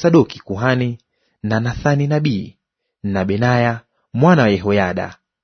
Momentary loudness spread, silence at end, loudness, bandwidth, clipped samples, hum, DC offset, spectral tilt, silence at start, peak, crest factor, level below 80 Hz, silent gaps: 15 LU; 0.3 s; -17 LUFS; 6.6 kHz; under 0.1%; none; under 0.1%; -7.5 dB/octave; 0 s; 0 dBFS; 16 dB; -46 dBFS; none